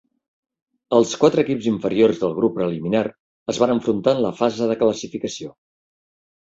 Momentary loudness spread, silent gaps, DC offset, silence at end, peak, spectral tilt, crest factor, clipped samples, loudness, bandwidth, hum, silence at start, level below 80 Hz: 11 LU; 3.20-3.46 s; under 0.1%; 1 s; -2 dBFS; -5.5 dB/octave; 18 dB; under 0.1%; -20 LUFS; 7.8 kHz; none; 0.9 s; -60 dBFS